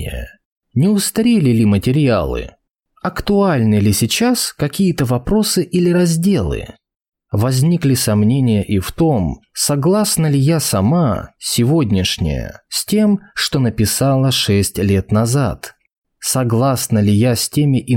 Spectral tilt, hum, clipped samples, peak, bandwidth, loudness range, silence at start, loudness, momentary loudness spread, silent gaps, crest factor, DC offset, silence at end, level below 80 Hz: -5.5 dB/octave; none; under 0.1%; -4 dBFS; 17.5 kHz; 1 LU; 0 s; -15 LUFS; 9 LU; 0.45-0.56 s, 15.98-16.02 s; 10 dB; under 0.1%; 0 s; -36 dBFS